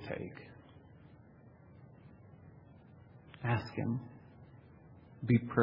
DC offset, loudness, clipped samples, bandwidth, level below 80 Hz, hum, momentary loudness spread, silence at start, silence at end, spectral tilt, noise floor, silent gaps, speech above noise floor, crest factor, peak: under 0.1%; -36 LUFS; under 0.1%; 5.6 kHz; -68 dBFS; none; 25 LU; 0 s; 0 s; -7.5 dB/octave; -59 dBFS; none; 25 dB; 24 dB; -14 dBFS